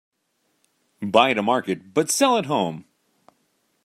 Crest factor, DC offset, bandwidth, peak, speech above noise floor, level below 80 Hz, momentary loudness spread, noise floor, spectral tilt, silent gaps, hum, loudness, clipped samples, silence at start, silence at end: 22 dB; under 0.1%; 16 kHz; -2 dBFS; 50 dB; -70 dBFS; 11 LU; -71 dBFS; -3.5 dB/octave; none; none; -21 LUFS; under 0.1%; 1 s; 1.05 s